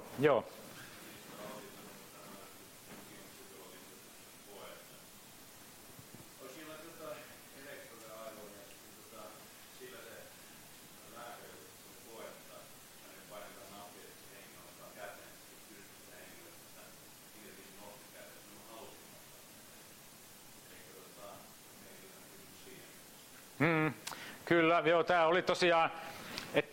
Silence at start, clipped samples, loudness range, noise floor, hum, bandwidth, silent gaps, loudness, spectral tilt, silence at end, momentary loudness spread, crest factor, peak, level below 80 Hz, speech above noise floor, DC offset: 0 s; under 0.1%; 20 LU; -56 dBFS; none; 16 kHz; none; -35 LUFS; -4.5 dB/octave; 0 s; 23 LU; 26 dB; -16 dBFS; -74 dBFS; 25 dB; under 0.1%